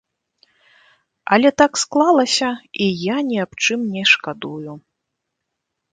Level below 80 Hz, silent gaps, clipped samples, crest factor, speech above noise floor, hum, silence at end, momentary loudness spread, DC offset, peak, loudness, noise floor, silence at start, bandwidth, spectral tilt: -62 dBFS; none; under 0.1%; 20 dB; 60 dB; none; 1.15 s; 15 LU; under 0.1%; 0 dBFS; -17 LUFS; -78 dBFS; 1.25 s; 9.6 kHz; -3.5 dB/octave